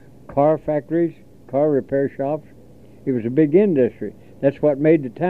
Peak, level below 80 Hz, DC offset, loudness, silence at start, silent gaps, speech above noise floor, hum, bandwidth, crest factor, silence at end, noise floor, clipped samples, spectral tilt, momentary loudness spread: -4 dBFS; -56 dBFS; 0.4%; -20 LUFS; 0.3 s; none; 28 dB; none; 4.2 kHz; 16 dB; 0 s; -46 dBFS; under 0.1%; -10.5 dB/octave; 10 LU